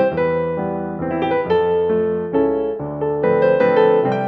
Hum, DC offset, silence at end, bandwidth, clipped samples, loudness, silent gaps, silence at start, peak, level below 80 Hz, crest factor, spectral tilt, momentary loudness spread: none; under 0.1%; 0 s; 5.2 kHz; under 0.1%; -18 LUFS; none; 0 s; -4 dBFS; -48 dBFS; 14 dB; -9 dB/octave; 9 LU